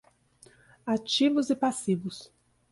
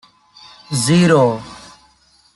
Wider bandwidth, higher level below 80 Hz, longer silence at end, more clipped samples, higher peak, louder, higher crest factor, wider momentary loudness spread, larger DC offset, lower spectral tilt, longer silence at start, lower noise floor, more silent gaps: about the same, 11.5 kHz vs 12 kHz; second, -70 dBFS vs -54 dBFS; second, 0.45 s vs 0.8 s; neither; second, -14 dBFS vs -2 dBFS; second, -27 LUFS vs -14 LUFS; about the same, 16 dB vs 16 dB; about the same, 16 LU vs 16 LU; neither; about the same, -4.5 dB/octave vs -5.5 dB/octave; first, 0.85 s vs 0.7 s; first, -59 dBFS vs -54 dBFS; neither